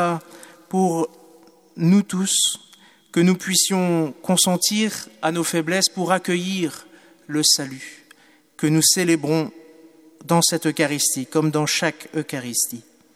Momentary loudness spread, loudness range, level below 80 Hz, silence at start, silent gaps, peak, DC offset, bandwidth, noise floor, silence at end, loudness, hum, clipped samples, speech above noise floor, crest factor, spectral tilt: 11 LU; 2 LU; -70 dBFS; 0 s; none; -2 dBFS; under 0.1%; 16 kHz; -53 dBFS; 0.35 s; -20 LUFS; none; under 0.1%; 33 dB; 20 dB; -3.5 dB/octave